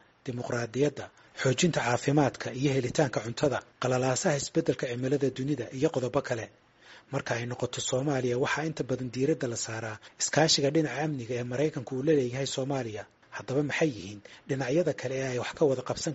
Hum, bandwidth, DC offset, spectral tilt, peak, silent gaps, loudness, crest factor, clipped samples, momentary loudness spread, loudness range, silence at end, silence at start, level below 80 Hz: none; 8 kHz; under 0.1%; -5 dB/octave; -10 dBFS; none; -29 LUFS; 20 dB; under 0.1%; 10 LU; 3 LU; 0 s; 0.25 s; -62 dBFS